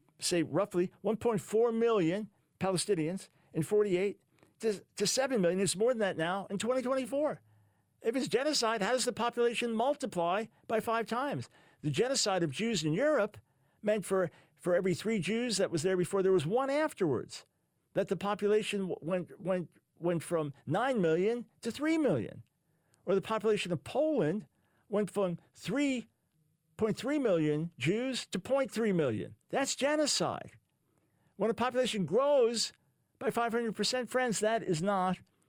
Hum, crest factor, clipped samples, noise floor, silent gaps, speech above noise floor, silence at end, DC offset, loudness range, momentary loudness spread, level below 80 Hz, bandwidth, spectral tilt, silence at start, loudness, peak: none; 14 dB; under 0.1%; -75 dBFS; none; 44 dB; 0.3 s; under 0.1%; 2 LU; 8 LU; -70 dBFS; 19 kHz; -4.5 dB/octave; 0.2 s; -32 LUFS; -18 dBFS